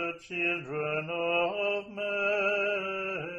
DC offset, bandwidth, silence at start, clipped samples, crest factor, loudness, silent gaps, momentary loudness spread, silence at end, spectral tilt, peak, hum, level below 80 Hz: under 0.1%; 9 kHz; 0 s; under 0.1%; 14 dB; -30 LUFS; none; 6 LU; 0 s; -5.5 dB/octave; -16 dBFS; none; -70 dBFS